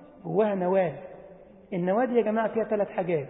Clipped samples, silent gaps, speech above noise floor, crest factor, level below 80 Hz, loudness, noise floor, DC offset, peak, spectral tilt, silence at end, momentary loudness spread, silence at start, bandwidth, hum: under 0.1%; none; 24 dB; 16 dB; -66 dBFS; -27 LUFS; -50 dBFS; under 0.1%; -12 dBFS; -11.5 dB/octave; 0 s; 9 LU; 0 s; 4 kHz; none